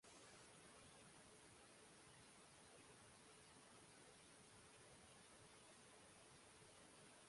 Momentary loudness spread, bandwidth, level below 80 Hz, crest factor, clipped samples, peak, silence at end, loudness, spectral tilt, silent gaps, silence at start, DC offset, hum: 1 LU; 11.5 kHz; -86 dBFS; 14 dB; under 0.1%; -52 dBFS; 0 s; -65 LUFS; -2.5 dB/octave; none; 0 s; under 0.1%; none